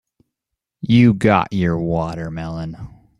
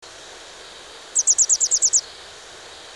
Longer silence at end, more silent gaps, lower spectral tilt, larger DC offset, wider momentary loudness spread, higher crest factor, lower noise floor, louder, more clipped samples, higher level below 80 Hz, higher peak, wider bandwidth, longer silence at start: first, 0.3 s vs 0 s; neither; first, -8 dB/octave vs 3 dB/octave; neither; second, 17 LU vs 24 LU; about the same, 18 dB vs 16 dB; first, -82 dBFS vs -41 dBFS; about the same, -17 LUFS vs -16 LUFS; neither; first, -44 dBFS vs -62 dBFS; first, -2 dBFS vs -6 dBFS; second, 10.5 kHz vs 16.5 kHz; first, 0.85 s vs 0.05 s